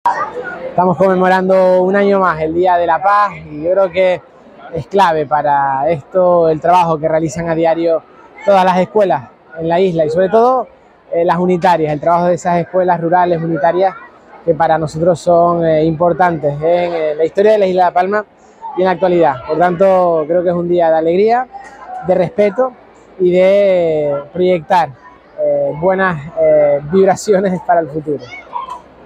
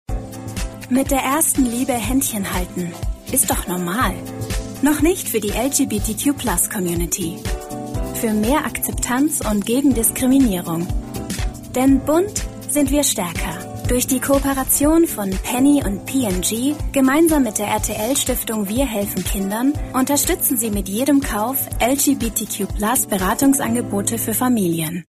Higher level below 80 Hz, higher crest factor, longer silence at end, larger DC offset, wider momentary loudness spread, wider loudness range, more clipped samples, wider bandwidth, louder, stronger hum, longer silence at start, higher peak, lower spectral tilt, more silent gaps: second, -50 dBFS vs -32 dBFS; about the same, 12 dB vs 16 dB; first, 0.25 s vs 0.1 s; neither; about the same, 9 LU vs 10 LU; about the same, 2 LU vs 3 LU; neither; second, 10 kHz vs 15.5 kHz; first, -13 LUFS vs -19 LUFS; neither; about the same, 0.05 s vs 0.1 s; about the same, 0 dBFS vs -2 dBFS; first, -7 dB/octave vs -4 dB/octave; neither